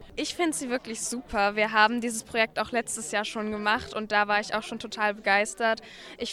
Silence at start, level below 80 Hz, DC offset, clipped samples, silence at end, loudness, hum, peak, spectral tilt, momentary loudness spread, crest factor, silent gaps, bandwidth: 0 s; -56 dBFS; under 0.1%; under 0.1%; 0 s; -27 LUFS; none; -8 dBFS; -2 dB/octave; 8 LU; 20 dB; none; 15.5 kHz